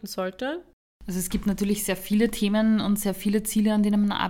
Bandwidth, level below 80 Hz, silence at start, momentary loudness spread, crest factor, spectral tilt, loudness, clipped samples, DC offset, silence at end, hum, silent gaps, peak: 17 kHz; -46 dBFS; 0.05 s; 10 LU; 16 dB; -5 dB/octave; -25 LUFS; under 0.1%; under 0.1%; 0 s; none; 0.73-1.00 s; -8 dBFS